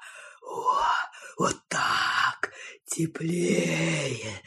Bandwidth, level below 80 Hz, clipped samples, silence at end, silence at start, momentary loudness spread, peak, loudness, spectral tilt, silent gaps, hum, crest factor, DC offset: 13 kHz; -64 dBFS; under 0.1%; 0.05 s; 0 s; 13 LU; -10 dBFS; -27 LUFS; -4 dB/octave; none; none; 18 dB; under 0.1%